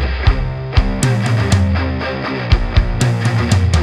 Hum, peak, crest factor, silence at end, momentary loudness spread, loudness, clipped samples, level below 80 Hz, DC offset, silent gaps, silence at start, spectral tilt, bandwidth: none; 0 dBFS; 14 dB; 0 s; 6 LU; -16 LUFS; under 0.1%; -20 dBFS; under 0.1%; none; 0 s; -6 dB/octave; 13 kHz